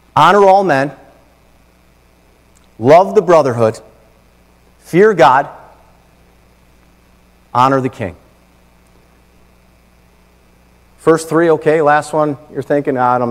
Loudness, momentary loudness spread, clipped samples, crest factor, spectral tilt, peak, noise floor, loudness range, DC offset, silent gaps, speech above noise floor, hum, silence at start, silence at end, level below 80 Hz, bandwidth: -12 LUFS; 13 LU; 0.6%; 14 dB; -6 dB/octave; 0 dBFS; -49 dBFS; 8 LU; under 0.1%; none; 38 dB; none; 0.15 s; 0 s; -50 dBFS; 15 kHz